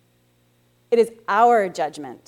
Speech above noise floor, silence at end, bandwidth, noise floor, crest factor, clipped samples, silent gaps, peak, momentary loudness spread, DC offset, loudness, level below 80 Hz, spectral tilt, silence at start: 42 dB; 0.1 s; 13.5 kHz; -61 dBFS; 16 dB; under 0.1%; none; -4 dBFS; 11 LU; under 0.1%; -20 LUFS; -72 dBFS; -4.5 dB/octave; 0.9 s